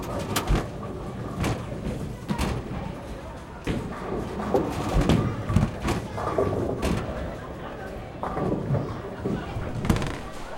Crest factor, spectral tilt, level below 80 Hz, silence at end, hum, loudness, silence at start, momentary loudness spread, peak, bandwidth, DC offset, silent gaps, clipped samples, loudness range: 22 dB; -6.5 dB/octave; -36 dBFS; 0 s; none; -29 LUFS; 0 s; 11 LU; -4 dBFS; 16.5 kHz; under 0.1%; none; under 0.1%; 5 LU